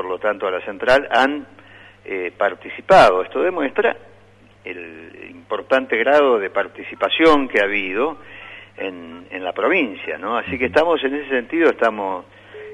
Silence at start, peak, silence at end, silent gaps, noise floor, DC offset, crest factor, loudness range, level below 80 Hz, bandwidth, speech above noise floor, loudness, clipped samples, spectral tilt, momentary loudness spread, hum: 0 s; -2 dBFS; 0 s; none; -49 dBFS; under 0.1%; 18 dB; 4 LU; -50 dBFS; 11.5 kHz; 31 dB; -18 LUFS; under 0.1%; -5 dB/octave; 20 LU; none